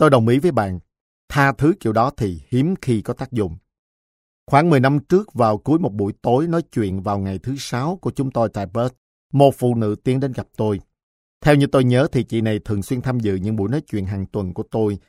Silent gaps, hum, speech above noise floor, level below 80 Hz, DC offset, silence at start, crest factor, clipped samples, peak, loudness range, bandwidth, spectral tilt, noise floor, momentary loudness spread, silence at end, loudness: 1.00-1.28 s, 3.79-4.47 s, 8.98-9.30 s, 11.03-11.41 s; none; over 71 dB; -46 dBFS; under 0.1%; 0 s; 18 dB; under 0.1%; 0 dBFS; 3 LU; 15 kHz; -7.5 dB/octave; under -90 dBFS; 10 LU; 0.1 s; -20 LUFS